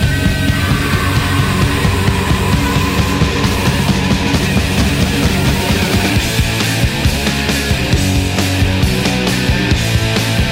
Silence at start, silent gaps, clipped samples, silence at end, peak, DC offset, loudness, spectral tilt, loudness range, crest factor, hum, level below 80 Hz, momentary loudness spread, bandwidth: 0 s; none; under 0.1%; 0 s; 0 dBFS; under 0.1%; -14 LUFS; -5 dB/octave; 0 LU; 12 dB; none; -22 dBFS; 1 LU; 16.5 kHz